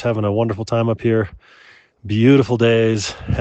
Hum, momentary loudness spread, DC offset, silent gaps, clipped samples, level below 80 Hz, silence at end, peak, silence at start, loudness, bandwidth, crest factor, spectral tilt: none; 9 LU; under 0.1%; none; under 0.1%; -44 dBFS; 0 s; -2 dBFS; 0 s; -17 LUFS; 8.4 kHz; 16 dB; -6.5 dB/octave